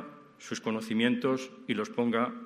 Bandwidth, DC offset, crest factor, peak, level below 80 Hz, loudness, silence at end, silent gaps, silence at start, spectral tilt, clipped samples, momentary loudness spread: 13 kHz; under 0.1%; 18 dB; -12 dBFS; -78 dBFS; -31 LUFS; 0 s; none; 0 s; -5 dB/octave; under 0.1%; 12 LU